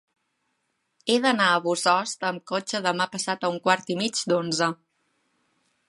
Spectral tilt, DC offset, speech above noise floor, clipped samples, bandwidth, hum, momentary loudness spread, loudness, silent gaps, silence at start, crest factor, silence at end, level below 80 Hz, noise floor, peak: -3 dB/octave; under 0.1%; 51 dB; under 0.1%; 11.5 kHz; none; 8 LU; -24 LUFS; none; 1.05 s; 22 dB; 1.15 s; -76 dBFS; -75 dBFS; -4 dBFS